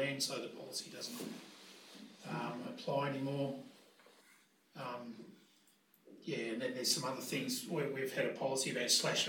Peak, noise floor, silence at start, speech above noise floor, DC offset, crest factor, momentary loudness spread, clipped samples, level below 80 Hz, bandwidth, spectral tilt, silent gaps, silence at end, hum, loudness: -18 dBFS; -70 dBFS; 0 s; 31 dB; under 0.1%; 22 dB; 20 LU; under 0.1%; under -90 dBFS; 19 kHz; -3 dB/octave; none; 0 s; none; -38 LUFS